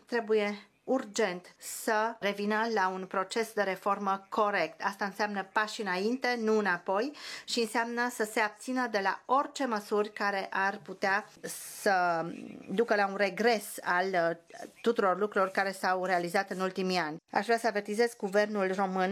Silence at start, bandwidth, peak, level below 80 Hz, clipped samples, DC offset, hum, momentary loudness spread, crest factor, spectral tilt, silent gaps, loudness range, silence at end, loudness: 0.1 s; 19 kHz; -12 dBFS; -84 dBFS; under 0.1%; under 0.1%; none; 6 LU; 20 dB; -4 dB/octave; none; 2 LU; 0 s; -31 LUFS